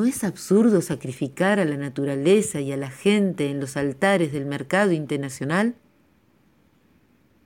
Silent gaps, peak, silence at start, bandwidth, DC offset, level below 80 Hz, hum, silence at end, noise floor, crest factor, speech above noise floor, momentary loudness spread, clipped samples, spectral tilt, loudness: none; -6 dBFS; 0 s; 17 kHz; under 0.1%; -62 dBFS; none; 1.7 s; -61 dBFS; 18 dB; 39 dB; 9 LU; under 0.1%; -5.5 dB/octave; -23 LUFS